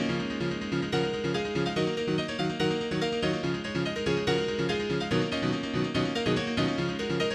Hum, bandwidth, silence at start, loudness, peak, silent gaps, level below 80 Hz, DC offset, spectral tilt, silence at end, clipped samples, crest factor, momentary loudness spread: none; 12.5 kHz; 0 s; -29 LUFS; -14 dBFS; none; -52 dBFS; under 0.1%; -5.5 dB/octave; 0 s; under 0.1%; 16 dB; 3 LU